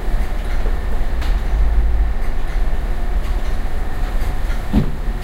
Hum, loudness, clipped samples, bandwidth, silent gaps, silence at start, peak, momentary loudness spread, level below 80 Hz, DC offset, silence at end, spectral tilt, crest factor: none; -23 LUFS; under 0.1%; 11 kHz; none; 0 s; -4 dBFS; 6 LU; -16 dBFS; under 0.1%; 0 s; -7 dB/octave; 12 dB